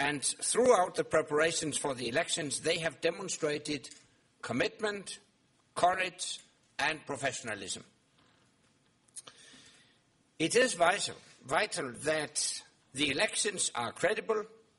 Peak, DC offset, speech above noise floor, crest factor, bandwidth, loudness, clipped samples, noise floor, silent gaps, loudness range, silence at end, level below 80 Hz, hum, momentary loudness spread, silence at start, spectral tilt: -12 dBFS; under 0.1%; 38 dB; 22 dB; 11.5 kHz; -32 LUFS; under 0.1%; -70 dBFS; none; 8 LU; 0.3 s; -70 dBFS; none; 16 LU; 0 s; -2 dB/octave